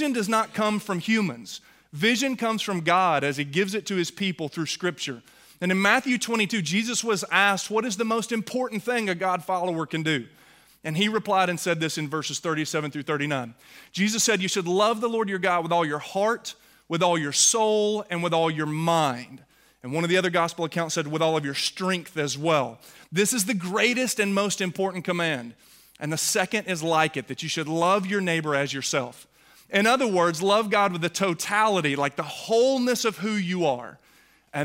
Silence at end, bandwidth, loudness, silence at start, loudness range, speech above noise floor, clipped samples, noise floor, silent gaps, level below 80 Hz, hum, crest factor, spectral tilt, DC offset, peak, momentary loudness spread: 0 s; 16 kHz; -24 LUFS; 0 s; 3 LU; 34 dB; under 0.1%; -59 dBFS; none; -70 dBFS; none; 20 dB; -3.5 dB/octave; under 0.1%; -4 dBFS; 9 LU